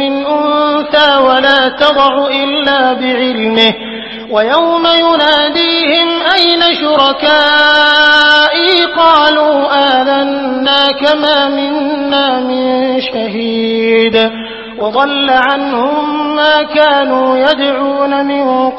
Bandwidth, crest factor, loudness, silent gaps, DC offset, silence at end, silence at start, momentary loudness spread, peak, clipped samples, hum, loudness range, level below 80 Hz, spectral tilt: 8 kHz; 10 dB; -9 LUFS; none; under 0.1%; 0 s; 0 s; 7 LU; 0 dBFS; 0.3%; none; 5 LU; -48 dBFS; -4.5 dB/octave